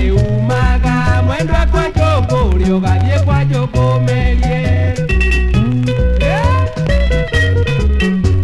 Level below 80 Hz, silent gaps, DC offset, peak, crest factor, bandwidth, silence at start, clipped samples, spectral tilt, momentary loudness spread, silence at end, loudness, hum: -16 dBFS; none; under 0.1%; 0 dBFS; 12 dB; 11.5 kHz; 0 s; under 0.1%; -7 dB/octave; 2 LU; 0 s; -14 LUFS; none